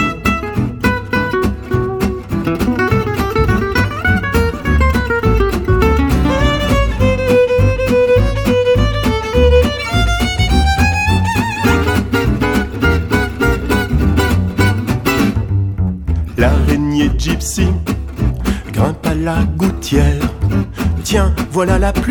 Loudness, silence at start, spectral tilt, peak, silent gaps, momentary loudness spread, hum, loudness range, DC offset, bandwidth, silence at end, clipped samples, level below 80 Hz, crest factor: -15 LUFS; 0 s; -6 dB/octave; 0 dBFS; none; 5 LU; none; 3 LU; under 0.1%; 19 kHz; 0 s; under 0.1%; -20 dBFS; 14 dB